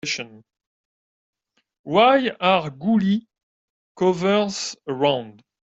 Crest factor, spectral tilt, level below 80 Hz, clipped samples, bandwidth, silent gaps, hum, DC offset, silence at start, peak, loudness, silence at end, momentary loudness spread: 18 dB; -5 dB/octave; -64 dBFS; under 0.1%; 8 kHz; 0.67-1.33 s, 1.79-1.84 s, 3.43-3.95 s; none; under 0.1%; 0.05 s; -4 dBFS; -21 LUFS; 0.35 s; 12 LU